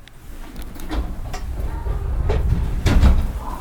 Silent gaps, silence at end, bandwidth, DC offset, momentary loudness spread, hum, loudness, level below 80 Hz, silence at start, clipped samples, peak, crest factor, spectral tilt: none; 0 s; 17.5 kHz; under 0.1%; 19 LU; none; -23 LUFS; -20 dBFS; 0.05 s; under 0.1%; -2 dBFS; 18 dB; -6.5 dB/octave